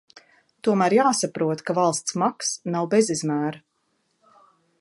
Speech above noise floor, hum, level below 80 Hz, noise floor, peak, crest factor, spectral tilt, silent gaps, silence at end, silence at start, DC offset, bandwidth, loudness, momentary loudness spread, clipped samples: 49 dB; none; -72 dBFS; -71 dBFS; -6 dBFS; 18 dB; -4.5 dB/octave; none; 1.2 s; 0.65 s; under 0.1%; 11.5 kHz; -23 LUFS; 8 LU; under 0.1%